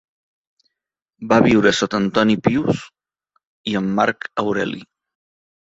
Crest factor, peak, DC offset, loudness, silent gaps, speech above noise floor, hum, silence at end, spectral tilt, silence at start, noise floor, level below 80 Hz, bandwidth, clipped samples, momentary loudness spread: 20 dB; 0 dBFS; under 0.1%; -18 LUFS; 3.47-3.64 s; 66 dB; none; 0.95 s; -5.5 dB/octave; 1.2 s; -83 dBFS; -52 dBFS; 8 kHz; under 0.1%; 12 LU